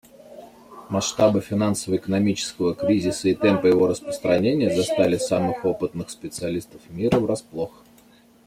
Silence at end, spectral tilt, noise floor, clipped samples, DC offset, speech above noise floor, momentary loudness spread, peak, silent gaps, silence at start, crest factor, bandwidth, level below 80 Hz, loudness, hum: 0.8 s; -5.5 dB/octave; -54 dBFS; under 0.1%; under 0.1%; 32 dB; 11 LU; -4 dBFS; none; 0.3 s; 18 dB; 15.5 kHz; -56 dBFS; -22 LUFS; none